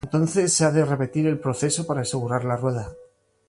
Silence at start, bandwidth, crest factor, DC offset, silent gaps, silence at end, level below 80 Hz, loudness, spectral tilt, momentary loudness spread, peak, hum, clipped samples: 0.05 s; 11.5 kHz; 16 dB; under 0.1%; none; 0.45 s; -54 dBFS; -23 LUFS; -5 dB/octave; 7 LU; -8 dBFS; none; under 0.1%